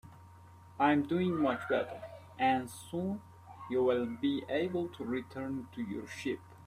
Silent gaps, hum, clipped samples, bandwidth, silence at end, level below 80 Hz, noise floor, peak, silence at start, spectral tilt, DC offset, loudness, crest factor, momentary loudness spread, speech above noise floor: none; none; under 0.1%; 15.5 kHz; 0 s; -70 dBFS; -55 dBFS; -16 dBFS; 0.05 s; -6.5 dB/octave; under 0.1%; -34 LUFS; 18 dB; 12 LU; 22 dB